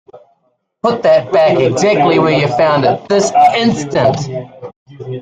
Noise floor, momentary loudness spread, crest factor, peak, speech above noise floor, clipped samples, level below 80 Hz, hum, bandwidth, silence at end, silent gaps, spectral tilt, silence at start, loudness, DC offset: -62 dBFS; 13 LU; 12 dB; 0 dBFS; 51 dB; under 0.1%; -50 dBFS; none; 9.4 kHz; 0 s; 4.76-4.86 s; -5.5 dB/octave; 0.15 s; -12 LUFS; under 0.1%